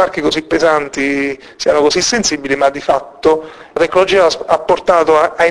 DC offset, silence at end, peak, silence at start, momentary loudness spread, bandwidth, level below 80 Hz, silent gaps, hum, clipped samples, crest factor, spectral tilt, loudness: under 0.1%; 0 s; 0 dBFS; 0 s; 6 LU; 11 kHz; -44 dBFS; none; none; under 0.1%; 14 dB; -3 dB/octave; -13 LUFS